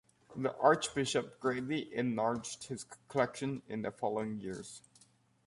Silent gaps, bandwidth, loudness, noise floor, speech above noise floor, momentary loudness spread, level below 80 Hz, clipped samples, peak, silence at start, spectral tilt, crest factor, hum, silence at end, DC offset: none; 11.5 kHz; -35 LUFS; -67 dBFS; 32 dB; 15 LU; -70 dBFS; under 0.1%; -12 dBFS; 0.3 s; -4.5 dB/octave; 24 dB; none; 0.7 s; under 0.1%